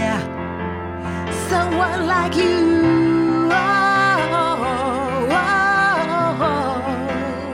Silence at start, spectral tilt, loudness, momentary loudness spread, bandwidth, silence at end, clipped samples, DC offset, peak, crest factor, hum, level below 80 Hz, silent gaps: 0 s; -5.5 dB/octave; -18 LUFS; 10 LU; 15.5 kHz; 0 s; under 0.1%; under 0.1%; -6 dBFS; 14 dB; none; -44 dBFS; none